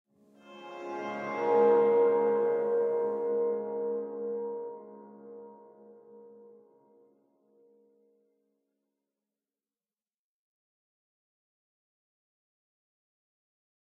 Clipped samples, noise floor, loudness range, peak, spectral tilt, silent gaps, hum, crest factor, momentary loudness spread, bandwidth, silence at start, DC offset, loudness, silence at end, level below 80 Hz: under 0.1%; under -90 dBFS; 16 LU; -14 dBFS; -7.5 dB/octave; none; none; 20 dB; 25 LU; 6 kHz; 0.45 s; under 0.1%; -29 LUFS; 7.65 s; under -90 dBFS